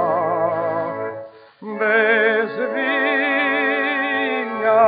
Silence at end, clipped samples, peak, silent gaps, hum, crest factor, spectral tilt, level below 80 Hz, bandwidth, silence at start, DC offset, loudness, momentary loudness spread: 0 s; under 0.1%; -2 dBFS; none; none; 16 dB; -1.5 dB/octave; -76 dBFS; 4.9 kHz; 0 s; under 0.1%; -19 LUFS; 12 LU